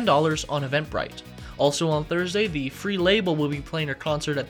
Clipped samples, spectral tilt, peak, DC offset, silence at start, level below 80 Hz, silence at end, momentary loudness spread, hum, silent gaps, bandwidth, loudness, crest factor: under 0.1%; -5 dB/octave; -8 dBFS; under 0.1%; 0 s; -46 dBFS; 0 s; 9 LU; none; none; 19 kHz; -25 LUFS; 18 dB